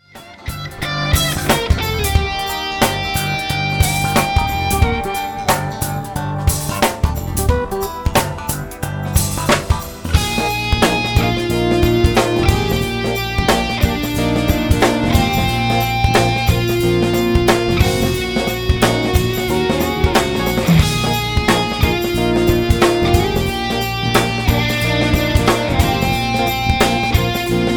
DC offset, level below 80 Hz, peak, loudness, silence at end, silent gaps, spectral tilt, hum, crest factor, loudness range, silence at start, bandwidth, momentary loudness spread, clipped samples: under 0.1%; -24 dBFS; 0 dBFS; -16 LUFS; 0 s; none; -5 dB/octave; none; 16 dB; 3 LU; 0.15 s; over 20 kHz; 6 LU; under 0.1%